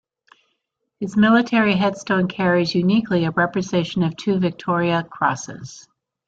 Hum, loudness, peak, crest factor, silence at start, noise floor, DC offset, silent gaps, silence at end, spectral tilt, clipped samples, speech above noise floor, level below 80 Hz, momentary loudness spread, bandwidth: none; -19 LUFS; -4 dBFS; 16 dB; 1 s; -75 dBFS; under 0.1%; none; 0.5 s; -6 dB/octave; under 0.1%; 56 dB; -58 dBFS; 9 LU; 7.8 kHz